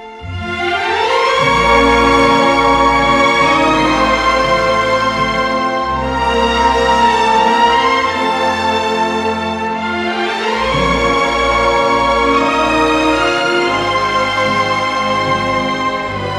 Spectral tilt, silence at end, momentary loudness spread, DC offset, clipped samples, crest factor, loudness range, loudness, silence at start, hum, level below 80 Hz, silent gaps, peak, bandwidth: -4 dB/octave; 0 s; 7 LU; under 0.1%; under 0.1%; 12 dB; 4 LU; -13 LUFS; 0 s; none; -32 dBFS; none; 0 dBFS; 14.5 kHz